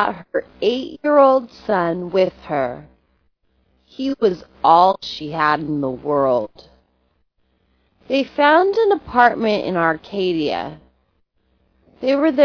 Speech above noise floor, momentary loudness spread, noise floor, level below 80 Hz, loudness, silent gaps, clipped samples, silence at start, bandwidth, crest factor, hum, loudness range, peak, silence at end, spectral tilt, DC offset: 47 dB; 12 LU; -64 dBFS; -54 dBFS; -18 LUFS; none; under 0.1%; 0 s; 5.4 kHz; 18 dB; none; 4 LU; 0 dBFS; 0 s; -6.5 dB/octave; under 0.1%